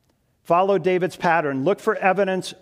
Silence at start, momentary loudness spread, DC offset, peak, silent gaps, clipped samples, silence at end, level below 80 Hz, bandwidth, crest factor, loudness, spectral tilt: 0.5 s; 3 LU; under 0.1%; -4 dBFS; none; under 0.1%; 0.1 s; -66 dBFS; 15 kHz; 18 dB; -21 LUFS; -6 dB/octave